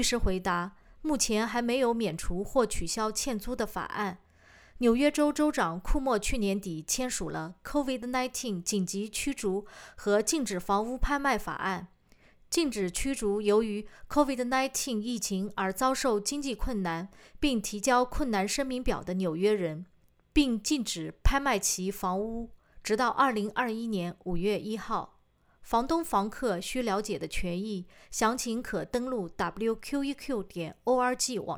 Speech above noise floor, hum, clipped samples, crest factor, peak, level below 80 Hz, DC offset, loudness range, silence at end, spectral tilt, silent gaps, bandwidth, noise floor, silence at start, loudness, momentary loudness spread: 36 dB; none; under 0.1%; 20 dB; -10 dBFS; -42 dBFS; under 0.1%; 3 LU; 0 s; -4 dB/octave; none; over 20 kHz; -65 dBFS; 0 s; -30 LUFS; 8 LU